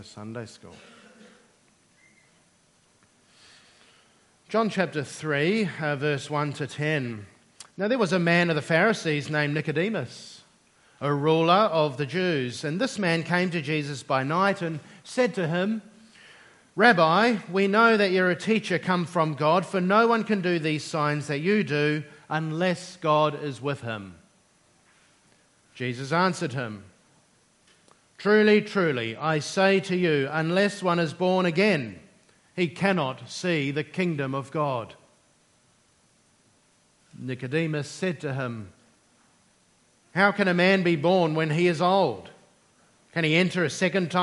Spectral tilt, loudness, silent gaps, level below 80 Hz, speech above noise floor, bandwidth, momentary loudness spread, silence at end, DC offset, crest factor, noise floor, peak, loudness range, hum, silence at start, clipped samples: -6 dB/octave; -25 LUFS; none; -72 dBFS; 39 dB; 11.5 kHz; 13 LU; 0 s; under 0.1%; 24 dB; -63 dBFS; -2 dBFS; 10 LU; none; 0 s; under 0.1%